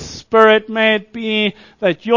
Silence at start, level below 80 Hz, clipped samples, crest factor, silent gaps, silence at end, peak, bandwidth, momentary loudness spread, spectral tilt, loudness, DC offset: 0 s; -50 dBFS; under 0.1%; 16 dB; none; 0 s; 0 dBFS; 7.4 kHz; 9 LU; -4.5 dB/octave; -15 LUFS; under 0.1%